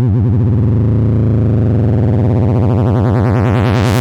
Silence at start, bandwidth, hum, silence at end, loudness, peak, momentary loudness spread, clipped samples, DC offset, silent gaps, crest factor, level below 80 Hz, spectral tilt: 0 s; 9 kHz; none; 0 s; -12 LUFS; -4 dBFS; 0 LU; under 0.1%; under 0.1%; none; 6 dB; -28 dBFS; -8.5 dB/octave